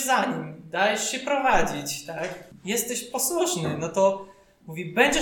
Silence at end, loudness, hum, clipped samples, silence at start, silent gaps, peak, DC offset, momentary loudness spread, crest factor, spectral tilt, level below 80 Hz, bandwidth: 0 s; -25 LUFS; none; under 0.1%; 0 s; none; -4 dBFS; under 0.1%; 12 LU; 20 dB; -3 dB/octave; -48 dBFS; 19 kHz